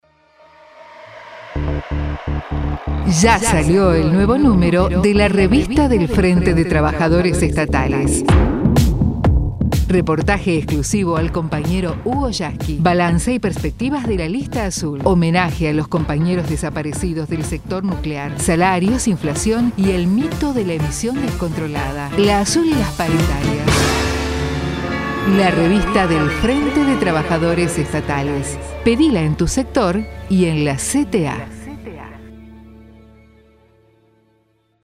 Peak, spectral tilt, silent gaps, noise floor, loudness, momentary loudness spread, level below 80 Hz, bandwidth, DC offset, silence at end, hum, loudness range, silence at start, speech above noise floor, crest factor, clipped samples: 0 dBFS; -5.5 dB/octave; none; -61 dBFS; -17 LUFS; 9 LU; -26 dBFS; 16 kHz; under 0.1%; 2 s; none; 5 LU; 0.75 s; 45 dB; 16 dB; under 0.1%